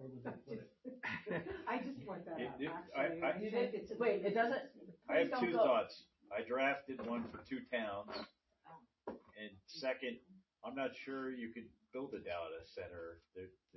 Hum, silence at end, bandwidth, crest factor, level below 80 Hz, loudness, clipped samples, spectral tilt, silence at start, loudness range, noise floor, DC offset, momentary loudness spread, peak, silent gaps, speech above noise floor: none; 0.25 s; 6 kHz; 20 dB; -74 dBFS; -41 LUFS; under 0.1%; -3.5 dB/octave; 0 s; 10 LU; -63 dBFS; under 0.1%; 17 LU; -22 dBFS; none; 22 dB